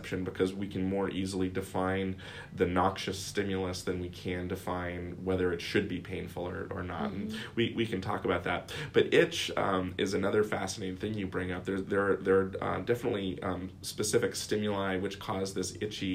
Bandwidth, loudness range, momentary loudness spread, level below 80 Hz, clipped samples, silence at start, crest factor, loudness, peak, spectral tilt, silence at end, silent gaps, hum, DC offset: 16 kHz; 4 LU; 9 LU; -58 dBFS; under 0.1%; 0 s; 22 dB; -32 LUFS; -10 dBFS; -5 dB/octave; 0 s; none; none; under 0.1%